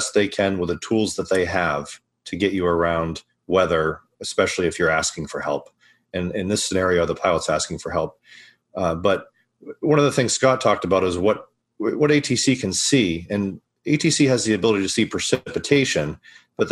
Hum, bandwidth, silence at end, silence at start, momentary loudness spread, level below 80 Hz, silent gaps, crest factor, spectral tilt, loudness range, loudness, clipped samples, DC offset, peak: none; 12.5 kHz; 0 s; 0 s; 11 LU; -50 dBFS; none; 18 dB; -4 dB/octave; 4 LU; -21 LUFS; under 0.1%; under 0.1%; -2 dBFS